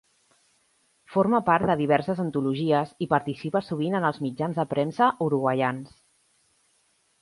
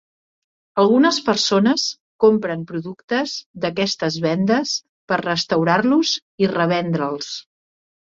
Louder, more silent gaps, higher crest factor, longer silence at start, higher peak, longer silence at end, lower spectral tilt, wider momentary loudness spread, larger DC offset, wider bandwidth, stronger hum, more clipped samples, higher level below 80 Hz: second, -25 LUFS vs -19 LUFS; second, none vs 2.00-2.19 s, 3.04-3.08 s, 3.46-3.54 s, 4.89-5.08 s, 6.22-6.38 s; about the same, 20 dB vs 18 dB; first, 1.1 s vs 0.75 s; second, -6 dBFS vs -2 dBFS; first, 1.35 s vs 0.7 s; first, -7.5 dB/octave vs -4.5 dB/octave; second, 6 LU vs 11 LU; neither; first, 11.5 kHz vs 7.8 kHz; neither; neither; about the same, -62 dBFS vs -60 dBFS